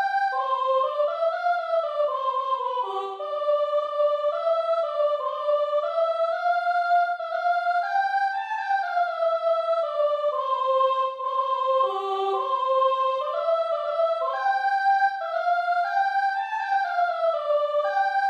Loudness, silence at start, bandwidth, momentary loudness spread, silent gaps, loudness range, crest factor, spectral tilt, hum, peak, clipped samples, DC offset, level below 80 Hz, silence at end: -24 LUFS; 0 s; 8.2 kHz; 4 LU; none; 1 LU; 12 dB; -1 dB/octave; none; -12 dBFS; under 0.1%; under 0.1%; -88 dBFS; 0 s